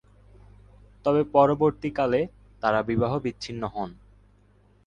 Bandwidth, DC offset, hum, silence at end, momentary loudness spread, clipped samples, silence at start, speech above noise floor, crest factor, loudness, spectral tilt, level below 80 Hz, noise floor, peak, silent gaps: 9.4 kHz; under 0.1%; 50 Hz at -50 dBFS; 0.95 s; 13 LU; under 0.1%; 1.05 s; 35 dB; 22 dB; -25 LUFS; -7.5 dB/octave; -52 dBFS; -59 dBFS; -6 dBFS; none